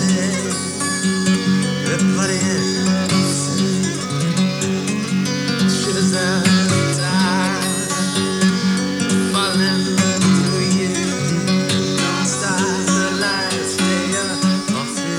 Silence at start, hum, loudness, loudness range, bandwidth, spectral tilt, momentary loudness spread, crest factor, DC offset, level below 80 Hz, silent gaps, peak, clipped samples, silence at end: 0 s; none; -17 LUFS; 1 LU; 14 kHz; -4 dB/octave; 4 LU; 16 dB; under 0.1%; -56 dBFS; none; -2 dBFS; under 0.1%; 0 s